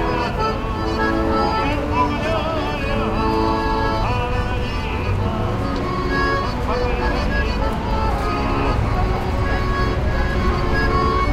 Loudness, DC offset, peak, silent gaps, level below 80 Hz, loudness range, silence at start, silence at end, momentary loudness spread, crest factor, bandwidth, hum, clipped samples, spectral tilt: -20 LUFS; under 0.1%; -6 dBFS; none; -24 dBFS; 1 LU; 0 s; 0 s; 4 LU; 14 dB; 13.5 kHz; none; under 0.1%; -6.5 dB/octave